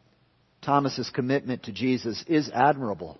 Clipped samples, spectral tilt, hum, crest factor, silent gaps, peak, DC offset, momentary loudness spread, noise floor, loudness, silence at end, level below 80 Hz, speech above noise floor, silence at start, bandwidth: under 0.1%; -6 dB/octave; none; 20 dB; none; -8 dBFS; under 0.1%; 7 LU; -65 dBFS; -26 LUFS; 0.05 s; -64 dBFS; 39 dB; 0.65 s; 6.2 kHz